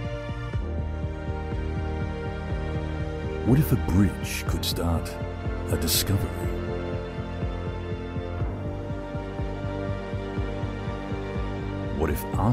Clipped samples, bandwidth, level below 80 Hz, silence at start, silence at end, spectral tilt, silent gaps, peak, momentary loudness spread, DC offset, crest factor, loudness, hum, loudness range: under 0.1%; 16 kHz; -34 dBFS; 0 s; 0 s; -5.5 dB/octave; none; -8 dBFS; 10 LU; under 0.1%; 20 dB; -29 LUFS; none; 6 LU